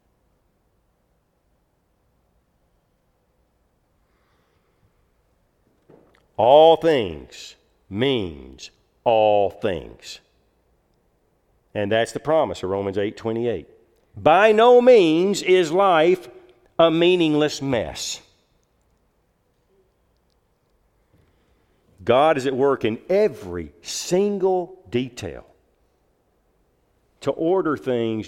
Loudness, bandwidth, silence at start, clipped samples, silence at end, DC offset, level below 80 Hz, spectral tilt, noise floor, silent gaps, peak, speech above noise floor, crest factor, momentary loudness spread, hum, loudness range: -19 LUFS; 14 kHz; 6.4 s; under 0.1%; 0 s; under 0.1%; -56 dBFS; -5 dB/octave; -67 dBFS; none; -2 dBFS; 48 dB; 20 dB; 21 LU; none; 10 LU